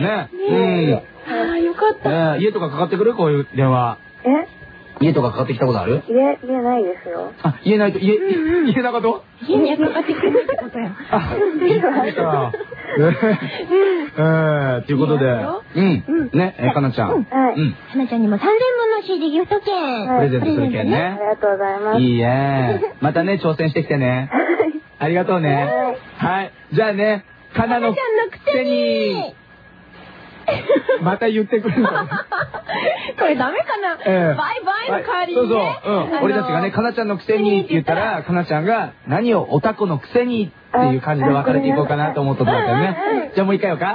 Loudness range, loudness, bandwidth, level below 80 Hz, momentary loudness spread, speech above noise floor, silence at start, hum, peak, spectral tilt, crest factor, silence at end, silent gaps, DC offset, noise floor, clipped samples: 2 LU; -18 LUFS; 5.2 kHz; -52 dBFS; 6 LU; 27 dB; 0 s; none; -4 dBFS; -10 dB/octave; 14 dB; 0 s; none; under 0.1%; -45 dBFS; under 0.1%